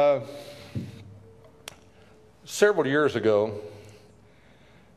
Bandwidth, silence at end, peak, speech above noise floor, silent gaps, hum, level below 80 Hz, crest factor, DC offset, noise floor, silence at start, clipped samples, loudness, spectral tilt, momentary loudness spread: 14.5 kHz; 1.05 s; -6 dBFS; 32 dB; none; none; -60 dBFS; 22 dB; under 0.1%; -56 dBFS; 0 s; under 0.1%; -25 LUFS; -5 dB/octave; 23 LU